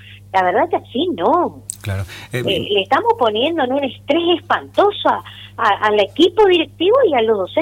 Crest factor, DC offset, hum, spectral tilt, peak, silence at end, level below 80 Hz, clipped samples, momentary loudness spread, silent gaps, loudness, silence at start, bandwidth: 14 dB; under 0.1%; none; -5 dB/octave; -2 dBFS; 0 s; -50 dBFS; under 0.1%; 10 LU; none; -16 LUFS; 0.05 s; 16.5 kHz